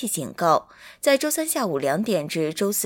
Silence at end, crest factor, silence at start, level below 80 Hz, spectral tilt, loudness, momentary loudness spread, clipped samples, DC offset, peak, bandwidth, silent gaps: 0 s; 18 dB; 0 s; -66 dBFS; -3.5 dB/octave; -23 LUFS; 4 LU; under 0.1%; under 0.1%; -6 dBFS; 17 kHz; none